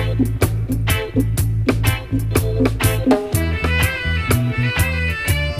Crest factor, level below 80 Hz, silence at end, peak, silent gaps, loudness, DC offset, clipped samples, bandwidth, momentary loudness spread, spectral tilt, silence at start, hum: 16 dB; -28 dBFS; 0 s; -2 dBFS; none; -19 LUFS; under 0.1%; under 0.1%; 16 kHz; 3 LU; -5.5 dB/octave; 0 s; none